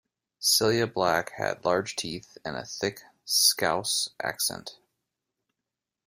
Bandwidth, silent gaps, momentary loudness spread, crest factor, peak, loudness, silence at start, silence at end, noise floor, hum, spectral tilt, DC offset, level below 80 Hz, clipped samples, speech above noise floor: 16 kHz; none; 15 LU; 22 dB; -6 dBFS; -26 LUFS; 0.4 s; 1.35 s; -87 dBFS; none; -2 dB/octave; under 0.1%; -64 dBFS; under 0.1%; 60 dB